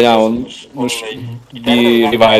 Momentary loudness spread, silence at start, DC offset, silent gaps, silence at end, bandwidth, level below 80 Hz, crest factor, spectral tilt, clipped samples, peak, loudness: 17 LU; 0 s; under 0.1%; none; 0 s; 15 kHz; -46 dBFS; 12 dB; -4.5 dB/octave; 0.2%; 0 dBFS; -14 LUFS